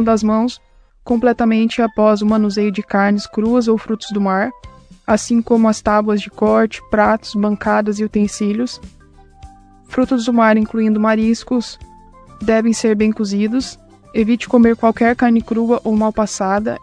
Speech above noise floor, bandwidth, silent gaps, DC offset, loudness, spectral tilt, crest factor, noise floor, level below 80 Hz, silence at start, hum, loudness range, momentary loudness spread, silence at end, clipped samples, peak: 27 dB; 10 kHz; none; under 0.1%; -16 LUFS; -5.5 dB/octave; 16 dB; -42 dBFS; -44 dBFS; 0 s; none; 3 LU; 8 LU; 0.05 s; under 0.1%; 0 dBFS